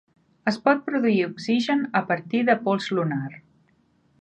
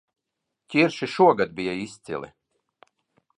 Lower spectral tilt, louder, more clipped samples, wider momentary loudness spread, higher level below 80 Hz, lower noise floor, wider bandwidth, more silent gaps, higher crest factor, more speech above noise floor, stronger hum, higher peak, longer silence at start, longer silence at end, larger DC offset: about the same, -6.5 dB/octave vs -6 dB/octave; about the same, -23 LUFS vs -23 LUFS; neither; second, 6 LU vs 16 LU; about the same, -70 dBFS vs -66 dBFS; second, -64 dBFS vs -82 dBFS; second, 9 kHz vs 10.5 kHz; neither; about the same, 20 dB vs 22 dB; second, 41 dB vs 60 dB; neither; about the same, -6 dBFS vs -4 dBFS; second, 0.45 s vs 0.7 s; second, 0.8 s vs 1.1 s; neither